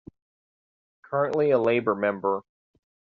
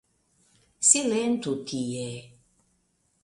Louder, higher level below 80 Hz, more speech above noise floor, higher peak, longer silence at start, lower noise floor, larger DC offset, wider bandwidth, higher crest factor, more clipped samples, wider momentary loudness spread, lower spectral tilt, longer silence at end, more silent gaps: about the same, -25 LUFS vs -24 LUFS; about the same, -68 dBFS vs -68 dBFS; first, over 66 dB vs 45 dB; second, -8 dBFS vs -4 dBFS; first, 1.1 s vs 0.8 s; first, under -90 dBFS vs -71 dBFS; neither; second, 6.8 kHz vs 11.5 kHz; second, 18 dB vs 26 dB; neither; second, 8 LU vs 16 LU; first, -5.5 dB/octave vs -3 dB/octave; second, 0.75 s vs 0.95 s; neither